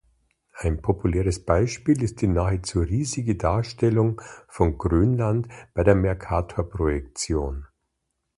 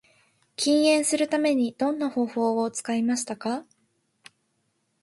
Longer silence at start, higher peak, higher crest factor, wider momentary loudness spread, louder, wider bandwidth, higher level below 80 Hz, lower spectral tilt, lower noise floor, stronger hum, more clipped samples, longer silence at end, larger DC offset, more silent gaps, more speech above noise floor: about the same, 0.55 s vs 0.6 s; first, -2 dBFS vs -10 dBFS; about the same, 20 dB vs 16 dB; about the same, 8 LU vs 10 LU; about the same, -24 LUFS vs -25 LUFS; about the same, 11.5 kHz vs 11.5 kHz; first, -34 dBFS vs -74 dBFS; first, -7 dB/octave vs -3 dB/octave; first, -78 dBFS vs -73 dBFS; neither; neither; second, 0.7 s vs 1.4 s; neither; neither; first, 55 dB vs 49 dB